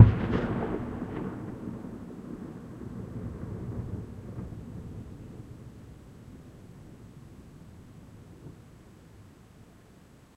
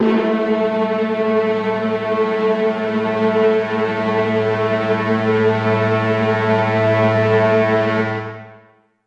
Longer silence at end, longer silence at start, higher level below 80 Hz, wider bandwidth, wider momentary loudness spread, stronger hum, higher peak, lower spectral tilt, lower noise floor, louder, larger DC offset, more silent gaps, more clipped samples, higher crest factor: first, 0.75 s vs 0.5 s; about the same, 0 s vs 0 s; first, -46 dBFS vs -58 dBFS; first, 8.6 kHz vs 7.6 kHz; first, 21 LU vs 5 LU; neither; about the same, -2 dBFS vs -4 dBFS; first, -9 dB/octave vs -7.5 dB/octave; first, -55 dBFS vs -51 dBFS; second, -34 LUFS vs -17 LUFS; neither; neither; neither; first, 30 dB vs 14 dB